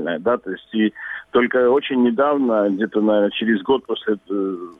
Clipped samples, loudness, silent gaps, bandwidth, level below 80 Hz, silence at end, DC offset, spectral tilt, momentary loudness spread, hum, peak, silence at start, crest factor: under 0.1%; -19 LUFS; none; 3.9 kHz; -62 dBFS; 0.05 s; under 0.1%; -8 dB/octave; 7 LU; none; -4 dBFS; 0 s; 16 dB